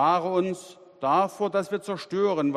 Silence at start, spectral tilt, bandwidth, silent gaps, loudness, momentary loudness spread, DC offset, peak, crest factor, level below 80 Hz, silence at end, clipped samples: 0 s; -6 dB/octave; 14 kHz; none; -26 LUFS; 8 LU; under 0.1%; -10 dBFS; 16 dB; -72 dBFS; 0 s; under 0.1%